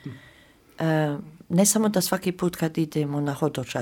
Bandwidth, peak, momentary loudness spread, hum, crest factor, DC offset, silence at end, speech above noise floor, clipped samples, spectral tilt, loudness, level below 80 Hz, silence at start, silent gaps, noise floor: 19 kHz; -8 dBFS; 9 LU; none; 18 dB; under 0.1%; 0 s; 30 dB; under 0.1%; -5 dB/octave; -24 LUFS; -60 dBFS; 0.05 s; none; -54 dBFS